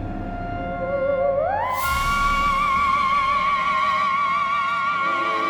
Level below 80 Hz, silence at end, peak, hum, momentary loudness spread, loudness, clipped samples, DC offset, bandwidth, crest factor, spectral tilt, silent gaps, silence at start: -36 dBFS; 0 s; -10 dBFS; none; 8 LU; -21 LUFS; under 0.1%; under 0.1%; 19.5 kHz; 12 dB; -4 dB/octave; none; 0 s